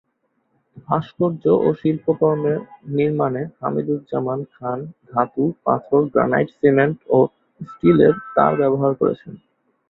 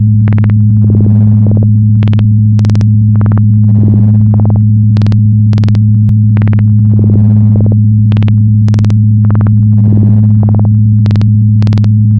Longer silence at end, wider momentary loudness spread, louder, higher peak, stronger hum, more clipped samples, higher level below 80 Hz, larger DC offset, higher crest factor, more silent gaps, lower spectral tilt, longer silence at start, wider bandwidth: first, 0.55 s vs 0 s; first, 10 LU vs 1 LU; second, -19 LUFS vs -7 LUFS; about the same, -2 dBFS vs 0 dBFS; neither; second, under 0.1% vs 1%; second, -58 dBFS vs -30 dBFS; second, under 0.1% vs 1%; first, 18 dB vs 6 dB; neither; about the same, -11 dB/octave vs -10.5 dB/octave; first, 0.75 s vs 0 s; first, 4.1 kHz vs 3.5 kHz